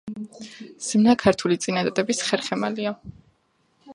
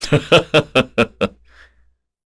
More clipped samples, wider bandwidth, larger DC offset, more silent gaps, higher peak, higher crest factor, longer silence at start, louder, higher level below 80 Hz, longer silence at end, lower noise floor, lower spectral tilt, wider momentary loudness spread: neither; about the same, 11.5 kHz vs 11 kHz; neither; neither; about the same, -2 dBFS vs 0 dBFS; about the same, 22 dB vs 18 dB; about the same, 0.05 s vs 0 s; second, -22 LUFS vs -16 LUFS; second, -58 dBFS vs -44 dBFS; second, 0 s vs 1 s; first, -66 dBFS vs -58 dBFS; about the same, -4.5 dB/octave vs -5 dB/octave; first, 20 LU vs 10 LU